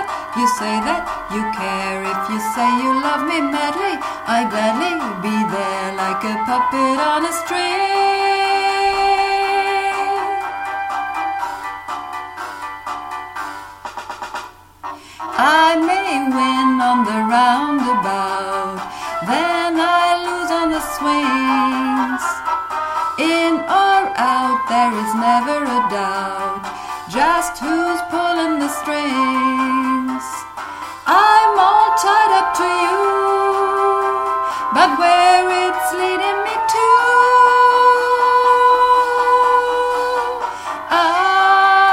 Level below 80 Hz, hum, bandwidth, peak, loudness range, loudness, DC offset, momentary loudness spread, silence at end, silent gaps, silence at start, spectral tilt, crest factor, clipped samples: -52 dBFS; none; 16.5 kHz; 0 dBFS; 6 LU; -16 LUFS; under 0.1%; 14 LU; 0 s; none; 0 s; -3 dB/octave; 16 dB; under 0.1%